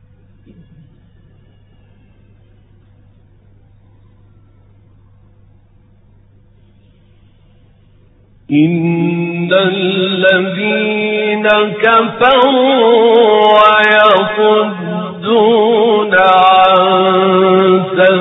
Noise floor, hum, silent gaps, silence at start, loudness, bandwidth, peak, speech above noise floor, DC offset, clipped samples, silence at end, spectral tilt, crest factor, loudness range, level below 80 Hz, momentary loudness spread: -46 dBFS; none; none; 8.5 s; -10 LUFS; 4.1 kHz; 0 dBFS; 36 dB; under 0.1%; under 0.1%; 0 s; -7.5 dB/octave; 12 dB; 9 LU; -52 dBFS; 7 LU